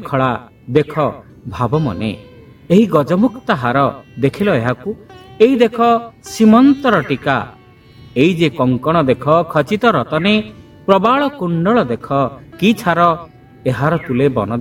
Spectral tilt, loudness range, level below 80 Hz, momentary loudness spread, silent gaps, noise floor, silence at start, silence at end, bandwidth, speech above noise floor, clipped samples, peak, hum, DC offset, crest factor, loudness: -7 dB/octave; 3 LU; -46 dBFS; 12 LU; none; -41 dBFS; 0 s; 0 s; 16 kHz; 27 dB; under 0.1%; 0 dBFS; none; under 0.1%; 14 dB; -15 LUFS